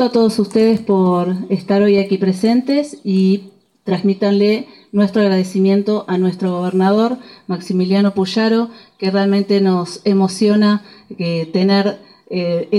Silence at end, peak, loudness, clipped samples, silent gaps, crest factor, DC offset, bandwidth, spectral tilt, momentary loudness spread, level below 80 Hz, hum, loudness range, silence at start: 0 s; -2 dBFS; -16 LUFS; under 0.1%; none; 12 dB; under 0.1%; 11.5 kHz; -7 dB/octave; 8 LU; -62 dBFS; none; 1 LU; 0 s